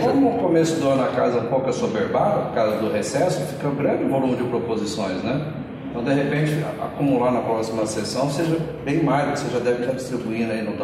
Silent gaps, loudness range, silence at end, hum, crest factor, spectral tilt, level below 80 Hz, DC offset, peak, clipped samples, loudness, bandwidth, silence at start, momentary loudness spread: none; 3 LU; 0 s; none; 14 dB; -6 dB/octave; -54 dBFS; under 0.1%; -8 dBFS; under 0.1%; -22 LUFS; 14.5 kHz; 0 s; 6 LU